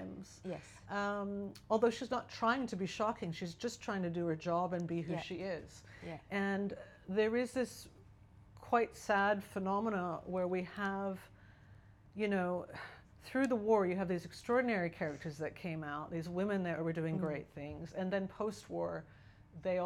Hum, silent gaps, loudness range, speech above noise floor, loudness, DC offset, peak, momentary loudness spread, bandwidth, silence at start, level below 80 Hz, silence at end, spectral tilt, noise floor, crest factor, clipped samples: none; none; 3 LU; 23 dB; -38 LUFS; under 0.1%; -18 dBFS; 14 LU; 13.5 kHz; 0 s; -66 dBFS; 0 s; -6 dB/octave; -60 dBFS; 20 dB; under 0.1%